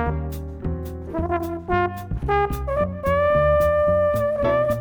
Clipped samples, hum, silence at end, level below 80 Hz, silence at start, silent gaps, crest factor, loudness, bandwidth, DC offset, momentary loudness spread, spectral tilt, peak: under 0.1%; none; 0 s; -32 dBFS; 0 s; none; 16 dB; -22 LUFS; over 20 kHz; under 0.1%; 12 LU; -7.5 dB/octave; -6 dBFS